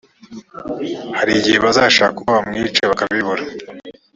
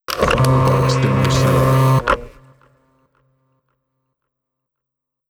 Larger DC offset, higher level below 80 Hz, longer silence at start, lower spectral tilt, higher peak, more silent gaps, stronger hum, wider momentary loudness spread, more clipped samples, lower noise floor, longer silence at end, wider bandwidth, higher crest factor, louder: neither; second, -50 dBFS vs -36 dBFS; first, 0.3 s vs 0.1 s; second, -3.5 dB/octave vs -6 dB/octave; about the same, 0 dBFS vs -2 dBFS; neither; neither; first, 19 LU vs 4 LU; neither; second, -38 dBFS vs -76 dBFS; second, 0.25 s vs 3 s; second, 7.8 kHz vs 17.5 kHz; about the same, 18 dB vs 16 dB; about the same, -15 LUFS vs -15 LUFS